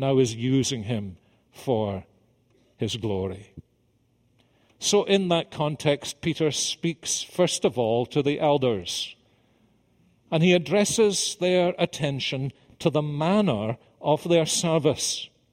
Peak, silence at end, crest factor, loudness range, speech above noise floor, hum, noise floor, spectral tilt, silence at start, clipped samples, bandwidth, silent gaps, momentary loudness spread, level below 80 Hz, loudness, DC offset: -6 dBFS; 0.25 s; 18 dB; 7 LU; 42 dB; none; -66 dBFS; -4.5 dB/octave; 0 s; under 0.1%; 16 kHz; none; 10 LU; -60 dBFS; -25 LUFS; under 0.1%